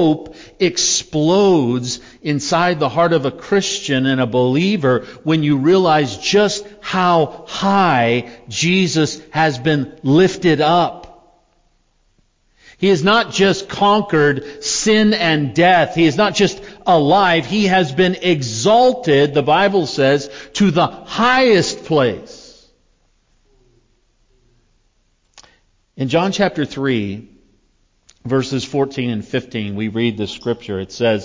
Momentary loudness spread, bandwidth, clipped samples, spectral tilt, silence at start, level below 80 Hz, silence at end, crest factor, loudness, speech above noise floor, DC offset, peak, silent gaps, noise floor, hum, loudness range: 9 LU; 7.6 kHz; under 0.1%; -4.5 dB/octave; 0 s; -50 dBFS; 0 s; 14 dB; -16 LUFS; 45 dB; under 0.1%; -4 dBFS; none; -60 dBFS; none; 8 LU